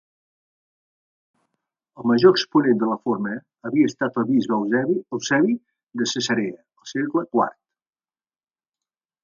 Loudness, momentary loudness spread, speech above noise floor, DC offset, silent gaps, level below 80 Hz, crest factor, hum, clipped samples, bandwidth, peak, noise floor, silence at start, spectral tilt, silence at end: -22 LUFS; 13 LU; over 69 dB; under 0.1%; none; -70 dBFS; 22 dB; none; under 0.1%; 7.4 kHz; -2 dBFS; under -90 dBFS; 2 s; -5 dB/octave; 1.75 s